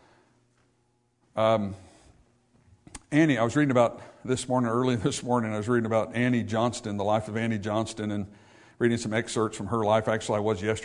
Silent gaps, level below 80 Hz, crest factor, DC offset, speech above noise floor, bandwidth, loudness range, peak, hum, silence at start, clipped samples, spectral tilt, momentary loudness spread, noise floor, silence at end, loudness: none; -62 dBFS; 20 dB; under 0.1%; 44 dB; 11 kHz; 3 LU; -8 dBFS; none; 1.35 s; under 0.1%; -6 dB/octave; 9 LU; -70 dBFS; 0 s; -27 LUFS